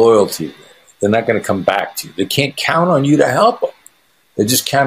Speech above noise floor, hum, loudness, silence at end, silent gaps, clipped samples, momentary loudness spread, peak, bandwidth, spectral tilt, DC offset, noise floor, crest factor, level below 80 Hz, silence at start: 42 dB; none; -15 LUFS; 0 s; none; under 0.1%; 11 LU; 0 dBFS; 15.5 kHz; -4.5 dB/octave; under 0.1%; -56 dBFS; 16 dB; -56 dBFS; 0 s